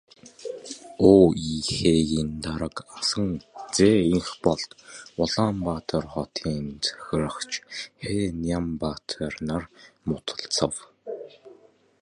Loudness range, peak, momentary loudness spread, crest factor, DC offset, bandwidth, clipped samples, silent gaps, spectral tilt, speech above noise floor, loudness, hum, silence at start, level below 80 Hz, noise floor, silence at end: 7 LU; -2 dBFS; 18 LU; 22 dB; under 0.1%; 11.5 kHz; under 0.1%; none; -5 dB/octave; 31 dB; -25 LUFS; none; 0.25 s; -46 dBFS; -55 dBFS; 0.5 s